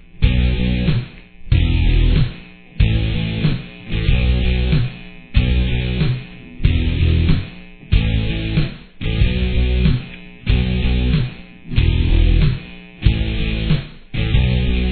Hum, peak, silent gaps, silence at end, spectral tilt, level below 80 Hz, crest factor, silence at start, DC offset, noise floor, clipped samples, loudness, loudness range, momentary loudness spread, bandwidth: none; 0 dBFS; none; 0 s; -10 dB/octave; -20 dBFS; 16 dB; 0.15 s; under 0.1%; -36 dBFS; under 0.1%; -19 LUFS; 1 LU; 10 LU; 4.5 kHz